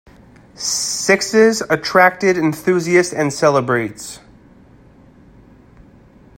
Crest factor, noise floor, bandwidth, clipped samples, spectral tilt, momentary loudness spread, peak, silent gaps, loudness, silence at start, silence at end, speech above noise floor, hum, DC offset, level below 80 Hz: 18 dB; -46 dBFS; 16.5 kHz; under 0.1%; -4 dB/octave; 13 LU; 0 dBFS; none; -15 LUFS; 0.6 s; 2.2 s; 31 dB; none; under 0.1%; -52 dBFS